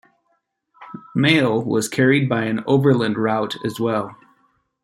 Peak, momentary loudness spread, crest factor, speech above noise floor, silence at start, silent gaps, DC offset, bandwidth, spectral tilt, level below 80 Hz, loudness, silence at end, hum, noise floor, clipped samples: -2 dBFS; 11 LU; 18 dB; 51 dB; 0.8 s; none; under 0.1%; 16 kHz; -6 dB/octave; -62 dBFS; -19 LUFS; 0.7 s; none; -69 dBFS; under 0.1%